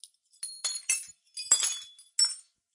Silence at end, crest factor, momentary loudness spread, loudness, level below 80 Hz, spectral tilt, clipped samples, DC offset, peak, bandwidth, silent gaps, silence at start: 0.35 s; 26 dB; 16 LU; -28 LUFS; under -90 dBFS; 5 dB/octave; under 0.1%; under 0.1%; -8 dBFS; 11.5 kHz; none; 0.05 s